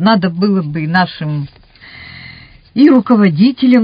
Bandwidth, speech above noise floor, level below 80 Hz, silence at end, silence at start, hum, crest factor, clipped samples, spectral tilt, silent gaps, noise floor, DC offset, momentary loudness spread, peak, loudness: 5.2 kHz; 26 dB; -48 dBFS; 0 s; 0 s; none; 12 dB; 0.1%; -9.5 dB/octave; none; -37 dBFS; under 0.1%; 22 LU; 0 dBFS; -12 LUFS